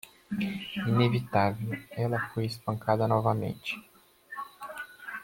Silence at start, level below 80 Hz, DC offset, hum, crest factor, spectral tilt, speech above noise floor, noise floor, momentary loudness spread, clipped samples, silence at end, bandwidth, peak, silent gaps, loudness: 0.05 s; -64 dBFS; under 0.1%; none; 20 dB; -7 dB/octave; 21 dB; -49 dBFS; 15 LU; under 0.1%; 0 s; 16.5 kHz; -10 dBFS; none; -30 LUFS